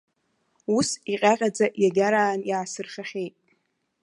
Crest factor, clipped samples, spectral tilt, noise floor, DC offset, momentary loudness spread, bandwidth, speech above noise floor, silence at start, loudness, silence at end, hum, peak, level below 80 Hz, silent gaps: 20 dB; under 0.1%; -4 dB/octave; -72 dBFS; under 0.1%; 13 LU; 11.5 kHz; 48 dB; 0.7 s; -24 LUFS; 0.75 s; none; -4 dBFS; -70 dBFS; none